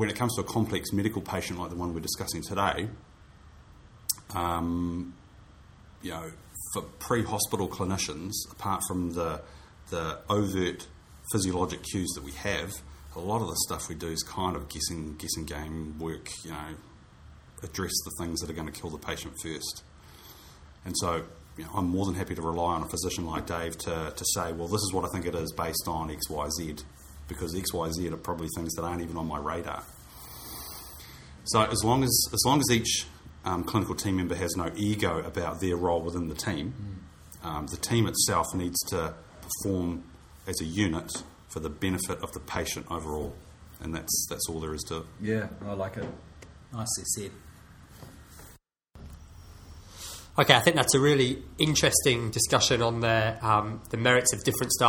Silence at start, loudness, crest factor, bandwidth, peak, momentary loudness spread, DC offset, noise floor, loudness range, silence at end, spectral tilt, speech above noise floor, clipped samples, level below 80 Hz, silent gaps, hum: 0 s; -29 LUFS; 30 dB; 18 kHz; 0 dBFS; 19 LU; under 0.1%; -56 dBFS; 11 LU; 0 s; -3.5 dB/octave; 27 dB; under 0.1%; -48 dBFS; none; none